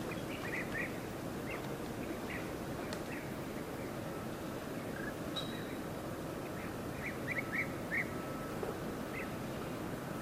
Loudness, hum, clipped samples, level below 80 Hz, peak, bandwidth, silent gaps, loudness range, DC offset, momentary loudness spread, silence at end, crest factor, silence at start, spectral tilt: -41 LUFS; none; under 0.1%; -58 dBFS; -24 dBFS; 16 kHz; none; 2 LU; under 0.1%; 6 LU; 0 s; 16 dB; 0 s; -5 dB/octave